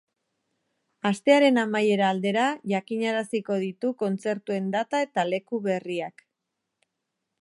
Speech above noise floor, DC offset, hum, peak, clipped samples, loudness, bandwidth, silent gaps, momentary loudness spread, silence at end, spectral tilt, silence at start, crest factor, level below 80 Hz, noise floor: 58 dB; under 0.1%; none; -6 dBFS; under 0.1%; -25 LUFS; 11.5 kHz; none; 9 LU; 1.35 s; -5.5 dB/octave; 1.05 s; 22 dB; -80 dBFS; -83 dBFS